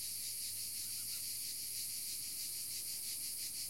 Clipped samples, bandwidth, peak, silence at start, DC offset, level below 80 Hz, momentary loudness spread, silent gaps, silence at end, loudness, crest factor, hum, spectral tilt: under 0.1%; 16.5 kHz; -30 dBFS; 0 s; 0.1%; -76 dBFS; 0 LU; none; 0 s; -40 LUFS; 14 dB; none; 1.5 dB/octave